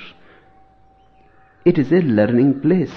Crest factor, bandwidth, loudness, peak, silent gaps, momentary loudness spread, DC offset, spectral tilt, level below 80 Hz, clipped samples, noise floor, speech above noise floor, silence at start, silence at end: 16 dB; 6 kHz; -16 LUFS; -2 dBFS; none; 3 LU; under 0.1%; -10 dB/octave; -54 dBFS; under 0.1%; -53 dBFS; 37 dB; 0 s; 0 s